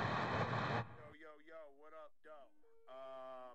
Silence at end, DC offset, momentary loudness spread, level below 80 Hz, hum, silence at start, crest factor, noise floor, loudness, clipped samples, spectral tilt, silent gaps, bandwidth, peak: 0 s; under 0.1%; 20 LU; -70 dBFS; none; 0 s; 20 dB; -66 dBFS; -42 LUFS; under 0.1%; -6.5 dB/octave; none; 8.4 kHz; -26 dBFS